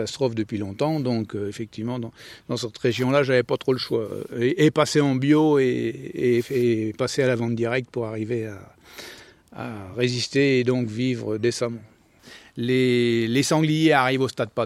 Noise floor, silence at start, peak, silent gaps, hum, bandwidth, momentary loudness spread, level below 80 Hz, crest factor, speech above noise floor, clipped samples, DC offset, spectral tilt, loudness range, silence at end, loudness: -49 dBFS; 0 s; -4 dBFS; none; none; 15 kHz; 14 LU; -62 dBFS; 20 dB; 26 dB; under 0.1%; under 0.1%; -5.5 dB/octave; 5 LU; 0 s; -23 LUFS